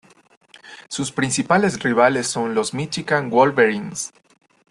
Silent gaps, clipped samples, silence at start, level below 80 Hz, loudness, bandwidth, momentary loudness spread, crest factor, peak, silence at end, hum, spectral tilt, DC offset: none; under 0.1%; 0.65 s; -60 dBFS; -19 LUFS; 12.5 kHz; 12 LU; 18 dB; -2 dBFS; 0.6 s; none; -4 dB/octave; under 0.1%